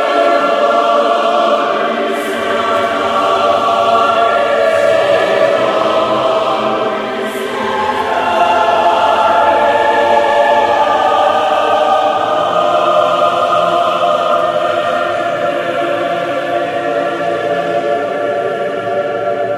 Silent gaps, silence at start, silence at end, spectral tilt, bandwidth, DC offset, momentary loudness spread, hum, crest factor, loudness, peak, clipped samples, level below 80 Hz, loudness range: none; 0 s; 0 s; -4 dB/octave; 14.5 kHz; under 0.1%; 6 LU; none; 12 dB; -13 LUFS; 0 dBFS; under 0.1%; -54 dBFS; 5 LU